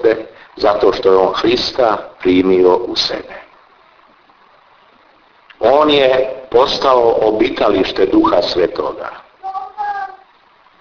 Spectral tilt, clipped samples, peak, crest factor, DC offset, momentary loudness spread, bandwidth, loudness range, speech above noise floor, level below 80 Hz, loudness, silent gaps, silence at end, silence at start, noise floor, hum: -5 dB/octave; under 0.1%; 0 dBFS; 14 dB; under 0.1%; 15 LU; 5.4 kHz; 5 LU; 37 dB; -44 dBFS; -14 LUFS; none; 0.65 s; 0 s; -49 dBFS; none